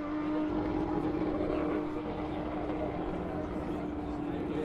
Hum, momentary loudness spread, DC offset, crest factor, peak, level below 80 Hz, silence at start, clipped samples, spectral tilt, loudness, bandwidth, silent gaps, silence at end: none; 4 LU; under 0.1%; 14 dB; -20 dBFS; -48 dBFS; 0 s; under 0.1%; -8.5 dB/octave; -34 LUFS; 6.6 kHz; none; 0 s